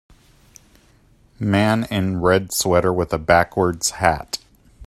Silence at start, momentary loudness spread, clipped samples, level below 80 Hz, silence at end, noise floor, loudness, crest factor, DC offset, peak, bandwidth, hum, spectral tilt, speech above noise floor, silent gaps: 1.4 s; 9 LU; under 0.1%; -44 dBFS; 0 s; -54 dBFS; -19 LUFS; 20 dB; under 0.1%; 0 dBFS; 16 kHz; none; -4.5 dB/octave; 36 dB; none